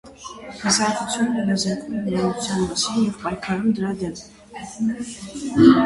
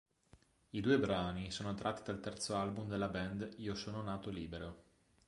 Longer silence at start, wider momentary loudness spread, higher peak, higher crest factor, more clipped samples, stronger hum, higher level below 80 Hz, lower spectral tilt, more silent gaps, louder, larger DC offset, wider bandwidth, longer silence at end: second, 0.05 s vs 0.35 s; first, 17 LU vs 12 LU; first, 0 dBFS vs -20 dBFS; about the same, 20 dB vs 22 dB; neither; neither; first, -50 dBFS vs -60 dBFS; about the same, -4.5 dB/octave vs -5.5 dB/octave; neither; first, -22 LUFS vs -40 LUFS; neither; about the same, 11.5 kHz vs 11.5 kHz; second, 0 s vs 0.45 s